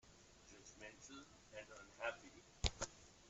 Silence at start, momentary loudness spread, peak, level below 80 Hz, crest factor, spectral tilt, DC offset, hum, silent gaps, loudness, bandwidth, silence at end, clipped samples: 0.05 s; 18 LU; -16 dBFS; -56 dBFS; 34 dB; -3 dB/octave; under 0.1%; none; none; -50 LUFS; 8.2 kHz; 0 s; under 0.1%